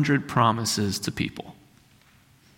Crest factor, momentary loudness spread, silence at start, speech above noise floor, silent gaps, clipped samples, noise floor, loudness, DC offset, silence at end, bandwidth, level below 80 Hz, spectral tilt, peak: 20 dB; 16 LU; 0 s; 33 dB; none; under 0.1%; -58 dBFS; -25 LUFS; under 0.1%; 1.05 s; 16.5 kHz; -56 dBFS; -4.5 dB/octave; -6 dBFS